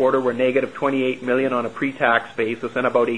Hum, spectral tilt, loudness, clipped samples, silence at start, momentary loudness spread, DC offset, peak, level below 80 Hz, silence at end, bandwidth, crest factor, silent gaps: none; -6.5 dB/octave; -21 LUFS; under 0.1%; 0 s; 5 LU; 0.4%; -2 dBFS; -64 dBFS; 0 s; 10.5 kHz; 18 dB; none